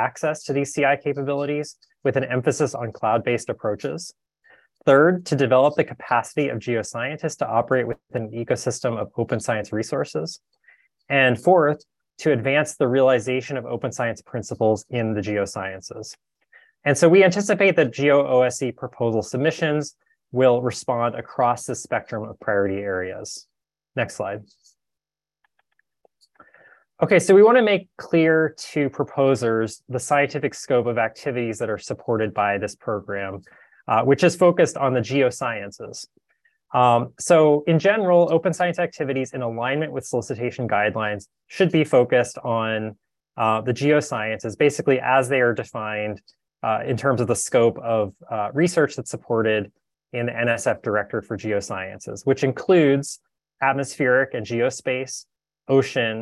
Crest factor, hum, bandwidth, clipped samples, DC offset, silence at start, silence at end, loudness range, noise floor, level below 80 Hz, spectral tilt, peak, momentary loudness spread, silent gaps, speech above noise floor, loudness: 18 dB; none; 12.5 kHz; under 0.1%; under 0.1%; 0 s; 0 s; 6 LU; -89 dBFS; -58 dBFS; -5.5 dB/octave; -4 dBFS; 13 LU; none; 68 dB; -21 LUFS